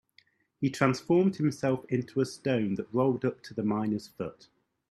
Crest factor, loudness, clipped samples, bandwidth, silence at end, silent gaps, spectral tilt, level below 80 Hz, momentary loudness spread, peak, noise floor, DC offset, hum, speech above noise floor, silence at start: 22 dB; -30 LUFS; under 0.1%; 13.5 kHz; 0.6 s; none; -7 dB/octave; -68 dBFS; 8 LU; -8 dBFS; -66 dBFS; under 0.1%; none; 37 dB; 0.6 s